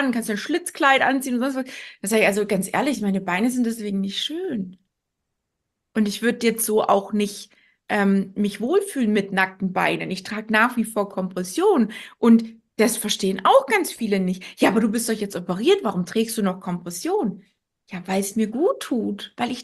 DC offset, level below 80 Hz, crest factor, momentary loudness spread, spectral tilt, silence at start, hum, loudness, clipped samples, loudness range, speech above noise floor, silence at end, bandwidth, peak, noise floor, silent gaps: under 0.1%; -64 dBFS; 20 dB; 10 LU; -4.5 dB/octave; 0 s; none; -22 LUFS; under 0.1%; 5 LU; 58 dB; 0 s; 13 kHz; -2 dBFS; -80 dBFS; none